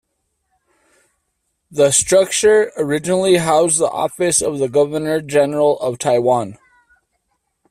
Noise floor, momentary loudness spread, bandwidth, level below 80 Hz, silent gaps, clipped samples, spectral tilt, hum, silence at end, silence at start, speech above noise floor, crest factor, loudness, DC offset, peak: -71 dBFS; 7 LU; 15 kHz; -54 dBFS; none; under 0.1%; -3.5 dB/octave; none; 1.15 s; 1.7 s; 56 dB; 16 dB; -15 LUFS; under 0.1%; 0 dBFS